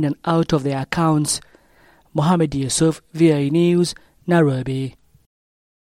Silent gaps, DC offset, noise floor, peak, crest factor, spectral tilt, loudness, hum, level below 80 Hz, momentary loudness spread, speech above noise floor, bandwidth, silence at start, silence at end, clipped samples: none; under 0.1%; -54 dBFS; -4 dBFS; 16 dB; -5.5 dB/octave; -19 LUFS; none; -48 dBFS; 9 LU; 36 dB; 14.5 kHz; 0 s; 0.9 s; under 0.1%